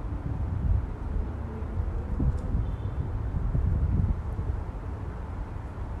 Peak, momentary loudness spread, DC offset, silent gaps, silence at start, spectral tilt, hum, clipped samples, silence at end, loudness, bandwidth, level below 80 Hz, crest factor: -12 dBFS; 9 LU; under 0.1%; none; 0 s; -10 dB/octave; none; under 0.1%; 0 s; -32 LUFS; 4.4 kHz; -32 dBFS; 16 dB